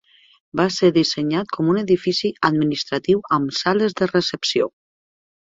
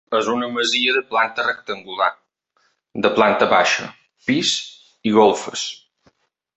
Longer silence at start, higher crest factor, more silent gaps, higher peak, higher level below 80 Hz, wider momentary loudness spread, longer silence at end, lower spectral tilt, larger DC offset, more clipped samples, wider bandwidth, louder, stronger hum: first, 0.55 s vs 0.1 s; about the same, 20 dB vs 20 dB; neither; about the same, 0 dBFS vs 0 dBFS; about the same, -58 dBFS vs -62 dBFS; second, 6 LU vs 13 LU; about the same, 0.9 s vs 0.8 s; first, -5 dB/octave vs -3 dB/octave; neither; neither; about the same, 7.8 kHz vs 8.4 kHz; about the same, -20 LUFS vs -19 LUFS; neither